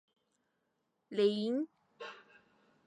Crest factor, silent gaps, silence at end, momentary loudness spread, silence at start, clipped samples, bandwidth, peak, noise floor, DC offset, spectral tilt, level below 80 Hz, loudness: 20 dB; none; 0.7 s; 19 LU; 1.1 s; under 0.1%; 9.8 kHz; -20 dBFS; -82 dBFS; under 0.1%; -6.5 dB/octave; under -90 dBFS; -34 LUFS